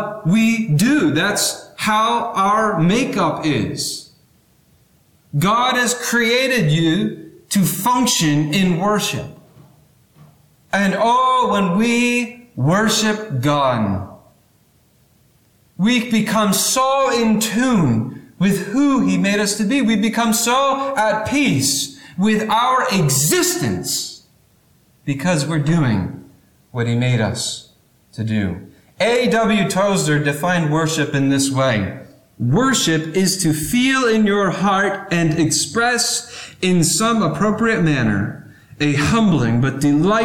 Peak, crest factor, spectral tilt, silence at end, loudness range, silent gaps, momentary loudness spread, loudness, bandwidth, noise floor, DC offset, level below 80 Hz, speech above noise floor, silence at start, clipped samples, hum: -6 dBFS; 12 dB; -4.5 dB/octave; 0 s; 4 LU; none; 8 LU; -17 LUFS; 19 kHz; -56 dBFS; under 0.1%; -48 dBFS; 39 dB; 0 s; under 0.1%; none